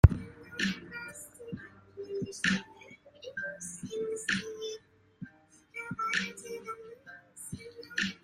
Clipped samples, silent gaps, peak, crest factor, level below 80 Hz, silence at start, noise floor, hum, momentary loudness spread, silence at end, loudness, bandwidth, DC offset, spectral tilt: under 0.1%; none; -2 dBFS; 30 dB; -42 dBFS; 0.05 s; -59 dBFS; none; 19 LU; 0.05 s; -35 LUFS; 14 kHz; under 0.1%; -5 dB/octave